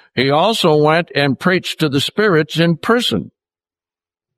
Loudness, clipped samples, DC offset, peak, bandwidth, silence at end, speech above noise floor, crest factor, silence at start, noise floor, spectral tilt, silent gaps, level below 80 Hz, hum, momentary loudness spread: -15 LUFS; under 0.1%; under 0.1%; -2 dBFS; 14 kHz; 1.1 s; over 75 dB; 14 dB; 0.15 s; under -90 dBFS; -5.5 dB/octave; none; -58 dBFS; none; 4 LU